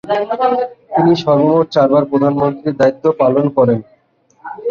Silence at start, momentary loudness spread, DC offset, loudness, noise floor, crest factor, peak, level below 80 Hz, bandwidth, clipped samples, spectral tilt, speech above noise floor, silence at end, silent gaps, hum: 0.05 s; 7 LU; under 0.1%; -14 LUFS; -55 dBFS; 14 dB; 0 dBFS; -54 dBFS; 7 kHz; under 0.1%; -8 dB/octave; 42 dB; 0 s; none; none